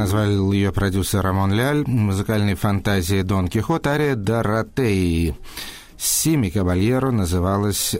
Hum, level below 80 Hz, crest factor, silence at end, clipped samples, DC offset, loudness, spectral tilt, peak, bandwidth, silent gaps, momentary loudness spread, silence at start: none; -36 dBFS; 14 dB; 0 s; under 0.1%; under 0.1%; -20 LUFS; -5.5 dB/octave; -6 dBFS; 16.5 kHz; none; 3 LU; 0 s